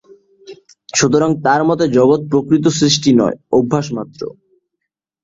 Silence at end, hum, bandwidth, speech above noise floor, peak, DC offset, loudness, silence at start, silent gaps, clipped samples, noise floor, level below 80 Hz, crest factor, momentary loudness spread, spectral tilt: 0.9 s; none; 7.8 kHz; 64 dB; 0 dBFS; under 0.1%; -14 LUFS; 0.5 s; none; under 0.1%; -77 dBFS; -52 dBFS; 16 dB; 13 LU; -5 dB/octave